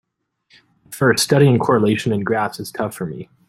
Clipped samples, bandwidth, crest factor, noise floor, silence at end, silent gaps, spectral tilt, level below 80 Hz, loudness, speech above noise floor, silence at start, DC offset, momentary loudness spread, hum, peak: under 0.1%; 16 kHz; 16 dB; -63 dBFS; 0.25 s; none; -5.5 dB/octave; -56 dBFS; -17 LUFS; 46 dB; 0.9 s; under 0.1%; 14 LU; none; -2 dBFS